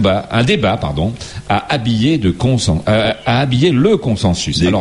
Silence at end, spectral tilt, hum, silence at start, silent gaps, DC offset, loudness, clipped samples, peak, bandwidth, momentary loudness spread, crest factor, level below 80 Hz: 0 s; -6 dB/octave; none; 0 s; none; under 0.1%; -14 LUFS; under 0.1%; 0 dBFS; 11.5 kHz; 6 LU; 14 dB; -34 dBFS